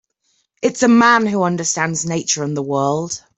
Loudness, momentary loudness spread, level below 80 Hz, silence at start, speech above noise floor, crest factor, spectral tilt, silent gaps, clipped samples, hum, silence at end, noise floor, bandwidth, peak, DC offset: -16 LUFS; 9 LU; -60 dBFS; 0.6 s; 49 dB; 16 dB; -4 dB/octave; none; under 0.1%; none; 0.2 s; -66 dBFS; 8.2 kHz; -2 dBFS; under 0.1%